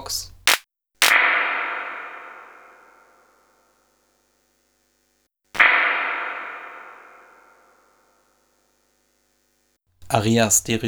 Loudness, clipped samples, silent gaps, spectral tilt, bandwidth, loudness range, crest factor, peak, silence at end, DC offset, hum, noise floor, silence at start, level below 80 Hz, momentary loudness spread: -19 LUFS; under 0.1%; none; -2 dB/octave; over 20 kHz; 17 LU; 24 dB; 0 dBFS; 0 s; under 0.1%; 50 Hz at -80 dBFS; -68 dBFS; 0 s; -58 dBFS; 24 LU